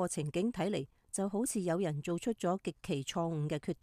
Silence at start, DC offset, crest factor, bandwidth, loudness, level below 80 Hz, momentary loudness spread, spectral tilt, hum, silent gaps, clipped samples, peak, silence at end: 0 s; under 0.1%; 14 dB; 15.5 kHz; -36 LUFS; -64 dBFS; 4 LU; -5.5 dB/octave; none; none; under 0.1%; -22 dBFS; 0.1 s